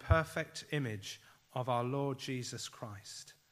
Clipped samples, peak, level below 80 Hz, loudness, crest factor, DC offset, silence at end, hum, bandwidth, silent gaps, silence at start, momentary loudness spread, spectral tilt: under 0.1%; -12 dBFS; -50 dBFS; -38 LUFS; 24 dB; under 0.1%; 0.2 s; none; 15.5 kHz; none; 0 s; 14 LU; -5 dB/octave